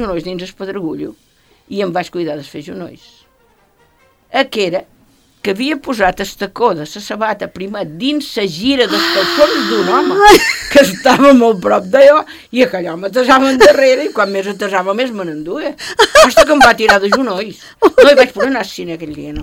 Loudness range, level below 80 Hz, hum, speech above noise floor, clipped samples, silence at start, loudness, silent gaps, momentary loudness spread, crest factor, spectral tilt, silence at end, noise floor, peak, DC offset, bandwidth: 13 LU; -40 dBFS; none; 41 dB; 0.9%; 0 s; -11 LUFS; none; 17 LU; 12 dB; -3.5 dB/octave; 0 s; -53 dBFS; 0 dBFS; under 0.1%; 17.5 kHz